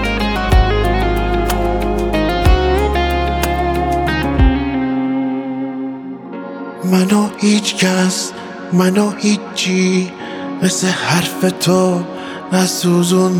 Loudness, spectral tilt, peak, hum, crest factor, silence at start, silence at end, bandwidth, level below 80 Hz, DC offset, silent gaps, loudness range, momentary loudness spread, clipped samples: -16 LUFS; -5 dB/octave; 0 dBFS; none; 14 dB; 0 s; 0 s; 19.5 kHz; -22 dBFS; under 0.1%; none; 2 LU; 11 LU; under 0.1%